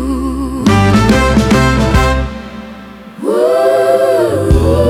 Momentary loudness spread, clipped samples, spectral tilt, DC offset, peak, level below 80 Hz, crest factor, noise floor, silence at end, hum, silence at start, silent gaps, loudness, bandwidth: 18 LU; under 0.1%; -6.5 dB/octave; under 0.1%; 0 dBFS; -20 dBFS; 10 dB; -31 dBFS; 0 s; none; 0 s; none; -11 LUFS; 16.5 kHz